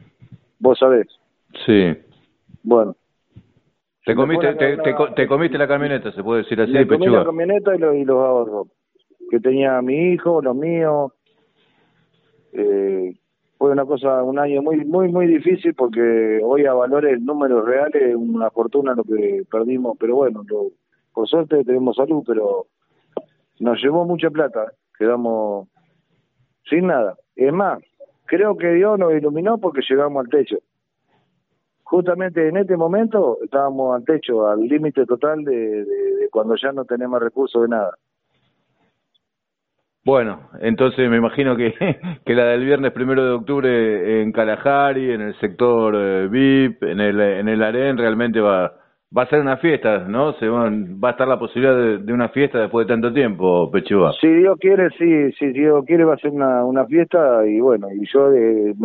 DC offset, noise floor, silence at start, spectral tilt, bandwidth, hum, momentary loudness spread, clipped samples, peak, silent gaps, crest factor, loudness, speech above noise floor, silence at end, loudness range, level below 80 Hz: under 0.1%; -80 dBFS; 0.3 s; -5 dB/octave; 4.3 kHz; none; 7 LU; under 0.1%; 0 dBFS; none; 18 dB; -18 LUFS; 63 dB; 0 s; 6 LU; -58 dBFS